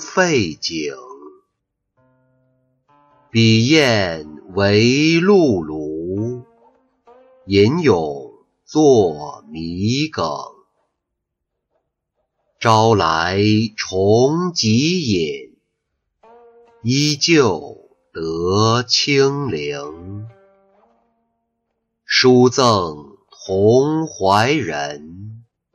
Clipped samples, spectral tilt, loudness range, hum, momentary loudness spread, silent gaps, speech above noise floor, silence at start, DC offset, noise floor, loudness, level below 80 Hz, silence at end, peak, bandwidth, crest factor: under 0.1%; -5 dB/octave; 6 LU; none; 18 LU; none; 62 dB; 0 s; under 0.1%; -78 dBFS; -16 LUFS; -52 dBFS; 0.35 s; -2 dBFS; 11 kHz; 16 dB